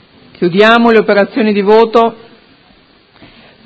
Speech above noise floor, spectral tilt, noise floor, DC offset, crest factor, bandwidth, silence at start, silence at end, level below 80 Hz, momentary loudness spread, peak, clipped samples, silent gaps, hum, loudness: 38 dB; -7 dB/octave; -46 dBFS; under 0.1%; 12 dB; 8 kHz; 0.4 s; 1.5 s; -52 dBFS; 8 LU; 0 dBFS; 0.6%; none; none; -9 LUFS